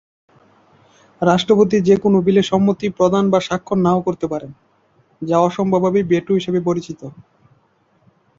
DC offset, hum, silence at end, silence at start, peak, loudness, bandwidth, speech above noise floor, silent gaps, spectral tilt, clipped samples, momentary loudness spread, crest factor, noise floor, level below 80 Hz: under 0.1%; none; 1.15 s; 1.2 s; -2 dBFS; -17 LUFS; 7.6 kHz; 43 dB; none; -7 dB/octave; under 0.1%; 11 LU; 16 dB; -59 dBFS; -54 dBFS